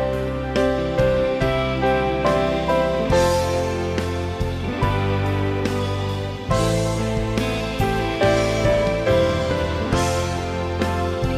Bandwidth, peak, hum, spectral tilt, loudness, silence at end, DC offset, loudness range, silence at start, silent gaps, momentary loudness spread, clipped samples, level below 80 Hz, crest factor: 15.5 kHz; -6 dBFS; none; -6 dB/octave; -21 LUFS; 0 s; under 0.1%; 3 LU; 0 s; none; 6 LU; under 0.1%; -32 dBFS; 14 dB